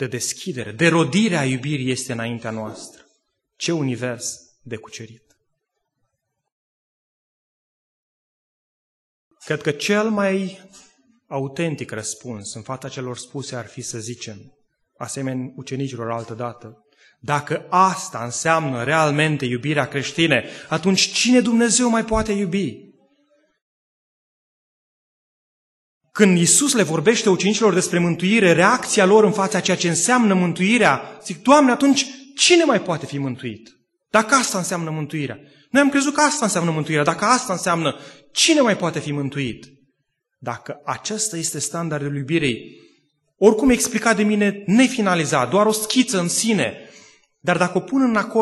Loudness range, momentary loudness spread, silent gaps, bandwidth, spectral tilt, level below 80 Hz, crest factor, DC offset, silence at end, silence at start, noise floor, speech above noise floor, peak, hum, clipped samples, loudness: 13 LU; 16 LU; 6.52-9.31 s, 23.61-26.01 s; 12.5 kHz; -4 dB/octave; -52 dBFS; 20 dB; under 0.1%; 0 s; 0 s; -76 dBFS; 57 dB; 0 dBFS; none; under 0.1%; -19 LUFS